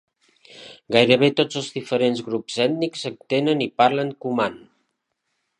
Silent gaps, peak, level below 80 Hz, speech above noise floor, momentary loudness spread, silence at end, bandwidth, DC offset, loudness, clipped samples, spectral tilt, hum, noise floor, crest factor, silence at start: none; 0 dBFS; -68 dBFS; 55 dB; 11 LU; 1 s; 10.5 kHz; under 0.1%; -21 LUFS; under 0.1%; -5 dB/octave; none; -75 dBFS; 22 dB; 0.55 s